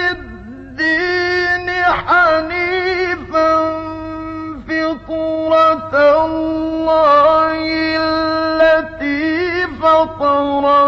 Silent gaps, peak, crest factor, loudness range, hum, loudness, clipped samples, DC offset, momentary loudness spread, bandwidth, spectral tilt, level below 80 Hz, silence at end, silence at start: none; -2 dBFS; 12 dB; 3 LU; none; -14 LUFS; under 0.1%; under 0.1%; 11 LU; 7.2 kHz; -5.5 dB/octave; -40 dBFS; 0 s; 0 s